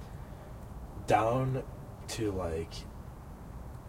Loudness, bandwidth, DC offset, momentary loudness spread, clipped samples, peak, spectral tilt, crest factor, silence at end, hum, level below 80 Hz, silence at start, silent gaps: -33 LUFS; 16 kHz; under 0.1%; 19 LU; under 0.1%; -14 dBFS; -6 dB/octave; 22 dB; 0 s; none; -48 dBFS; 0 s; none